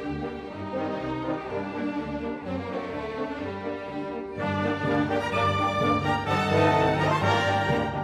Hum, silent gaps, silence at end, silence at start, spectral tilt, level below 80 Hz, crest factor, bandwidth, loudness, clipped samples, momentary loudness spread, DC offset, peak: none; none; 0 s; 0 s; -6.5 dB/octave; -50 dBFS; 18 dB; 13 kHz; -27 LUFS; under 0.1%; 11 LU; under 0.1%; -8 dBFS